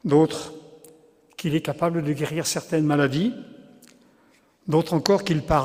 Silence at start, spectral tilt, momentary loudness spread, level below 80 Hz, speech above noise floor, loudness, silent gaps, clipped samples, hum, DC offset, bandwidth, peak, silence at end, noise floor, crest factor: 0.05 s; -5.5 dB/octave; 18 LU; -48 dBFS; 37 dB; -23 LUFS; none; under 0.1%; none; under 0.1%; 16 kHz; 0 dBFS; 0 s; -59 dBFS; 24 dB